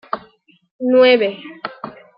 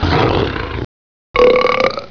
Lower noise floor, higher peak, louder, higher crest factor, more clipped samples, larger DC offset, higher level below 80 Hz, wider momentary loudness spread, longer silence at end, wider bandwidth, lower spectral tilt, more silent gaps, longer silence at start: second, -52 dBFS vs under -90 dBFS; about the same, -2 dBFS vs 0 dBFS; about the same, -14 LUFS vs -14 LUFS; about the same, 16 dB vs 14 dB; neither; neither; second, -68 dBFS vs -30 dBFS; first, 19 LU vs 15 LU; first, 0.25 s vs 0 s; about the same, 5.4 kHz vs 5.4 kHz; first, -8.5 dB/octave vs -6.5 dB/octave; second, 0.71-0.79 s vs 0.85-1.34 s; first, 0.15 s vs 0 s